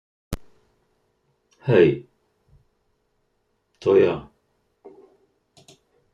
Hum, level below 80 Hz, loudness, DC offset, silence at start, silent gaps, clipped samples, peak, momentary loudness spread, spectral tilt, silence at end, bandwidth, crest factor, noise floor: none; -52 dBFS; -20 LUFS; under 0.1%; 0.3 s; none; under 0.1%; -4 dBFS; 20 LU; -7.5 dB/octave; 1.9 s; 13 kHz; 22 dB; -71 dBFS